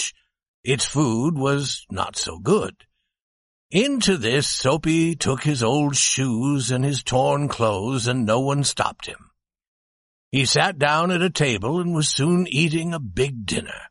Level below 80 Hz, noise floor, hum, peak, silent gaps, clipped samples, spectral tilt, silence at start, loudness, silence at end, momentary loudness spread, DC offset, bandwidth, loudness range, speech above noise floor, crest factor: -50 dBFS; under -90 dBFS; none; -4 dBFS; 0.48-0.63 s, 3.22-3.70 s, 9.67-10.31 s; under 0.1%; -4 dB/octave; 0 s; -21 LUFS; 0.05 s; 7 LU; under 0.1%; 11.5 kHz; 3 LU; over 69 dB; 18 dB